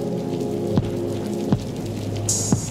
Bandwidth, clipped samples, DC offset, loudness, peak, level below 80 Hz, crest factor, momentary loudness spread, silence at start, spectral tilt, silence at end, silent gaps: 16 kHz; under 0.1%; under 0.1%; -24 LUFS; -4 dBFS; -44 dBFS; 18 dB; 6 LU; 0 s; -5.5 dB/octave; 0 s; none